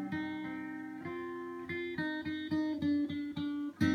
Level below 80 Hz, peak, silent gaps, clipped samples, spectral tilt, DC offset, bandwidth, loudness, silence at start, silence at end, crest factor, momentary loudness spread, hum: -66 dBFS; -18 dBFS; none; under 0.1%; -6.5 dB/octave; under 0.1%; 10 kHz; -37 LUFS; 0 s; 0 s; 18 dB; 9 LU; none